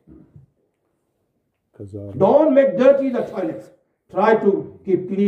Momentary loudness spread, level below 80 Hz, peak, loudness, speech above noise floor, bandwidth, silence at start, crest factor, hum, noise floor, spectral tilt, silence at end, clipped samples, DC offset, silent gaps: 19 LU; -64 dBFS; -2 dBFS; -18 LUFS; 54 dB; 6.6 kHz; 1.8 s; 18 dB; none; -71 dBFS; -8.5 dB/octave; 0 s; under 0.1%; under 0.1%; none